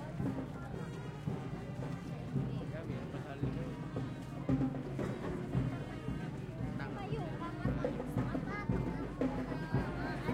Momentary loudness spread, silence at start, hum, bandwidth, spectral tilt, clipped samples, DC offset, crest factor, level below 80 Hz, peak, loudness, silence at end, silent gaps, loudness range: 6 LU; 0 s; none; 12.5 kHz; -8 dB/octave; under 0.1%; under 0.1%; 18 dB; -52 dBFS; -20 dBFS; -39 LUFS; 0 s; none; 3 LU